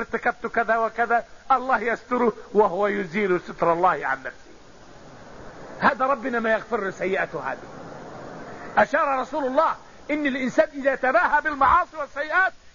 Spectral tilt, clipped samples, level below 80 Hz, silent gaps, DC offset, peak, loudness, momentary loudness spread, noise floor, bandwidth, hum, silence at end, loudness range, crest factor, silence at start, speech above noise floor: -5.5 dB/octave; under 0.1%; -52 dBFS; none; 0.3%; -6 dBFS; -23 LUFS; 18 LU; -48 dBFS; 7.4 kHz; none; 0.15 s; 4 LU; 18 dB; 0 s; 25 dB